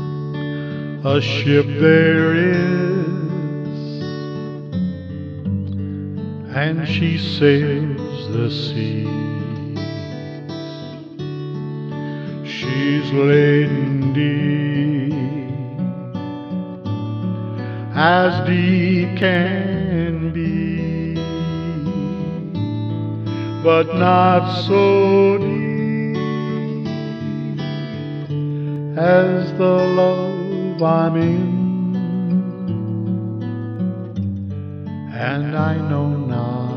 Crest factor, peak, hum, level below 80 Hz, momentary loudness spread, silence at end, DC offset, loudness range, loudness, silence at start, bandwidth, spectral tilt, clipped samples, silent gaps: 18 dB; 0 dBFS; none; -50 dBFS; 13 LU; 0 s; under 0.1%; 8 LU; -19 LUFS; 0 s; 6.6 kHz; -8.5 dB/octave; under 0.1%; none